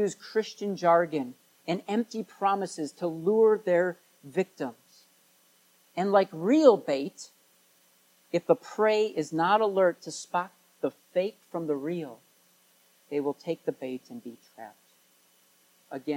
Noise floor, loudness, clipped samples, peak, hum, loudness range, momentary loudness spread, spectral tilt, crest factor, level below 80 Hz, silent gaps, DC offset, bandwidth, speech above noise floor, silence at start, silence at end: -64 dBFS; -28 LUFS; under 0.1%; -6 dBFS; none; 10 LU; 19 LU; -5.5 dB/octave; 24 dB; -86 dBFS; none; under 0.1%; 16.5 kHz; 37 dB; 0 s; 0 s